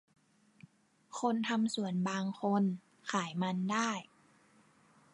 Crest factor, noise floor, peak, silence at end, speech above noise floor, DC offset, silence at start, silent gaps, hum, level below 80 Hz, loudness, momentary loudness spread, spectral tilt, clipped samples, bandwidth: 18 dB; -66 dBFS; -18 dBFS; 1.1 s; 33 dB; under 0.1%; 1.1 s; none; none; -84 dBFS; -35 LUFS; 5 LU; -5 dB/octave; under 0.1%; 11.5 kHz